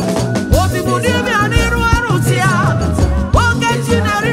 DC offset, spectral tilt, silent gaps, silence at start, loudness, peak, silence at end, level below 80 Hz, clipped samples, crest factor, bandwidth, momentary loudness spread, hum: under 0.1%; -5.5 dB/octave; none; 0 s; -14 LUFS; 0 dBFS; 0 s; -22 dBFS; under 0.1%; 12 dB; 16 kHz; 2 LU; none